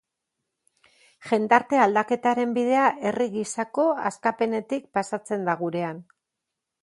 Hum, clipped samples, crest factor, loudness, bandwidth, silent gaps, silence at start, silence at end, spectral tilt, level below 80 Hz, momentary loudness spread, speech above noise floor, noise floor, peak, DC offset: none; under 0.1%; 24 dB; -24 LUFS; 11.5 kHz; none; 1.2 s; 0.8 s; -5 dB/octave; -74 dBFS; 9 LU; 60 dB; -84 dBFS; -2 dBFS; under 0.1%